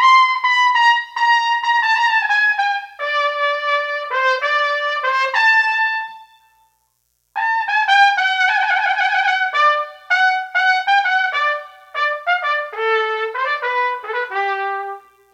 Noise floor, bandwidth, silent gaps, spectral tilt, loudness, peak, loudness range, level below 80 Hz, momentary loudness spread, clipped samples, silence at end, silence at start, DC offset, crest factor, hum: -67 dBFS; 10.5 kHz; none; 2 dB/octave; -16 LUFS; -2 dBFS; 4 LU; -76 dBFS; 9 LU; under 0.1%; 0.35 s; 0 s; under 0.1%; 16 dB; 60 Hz at -80 dBFS